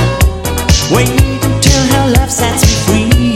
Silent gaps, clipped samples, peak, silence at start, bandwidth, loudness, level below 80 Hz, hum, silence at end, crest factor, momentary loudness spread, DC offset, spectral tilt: none; 0.2%; 0 dBFS; 0 s; 16.5 kHz; -10 LUFS; -16 dBFS; none; 0 s; 10 dB; 3 LU; under 0.1%; -4.5 dB/octave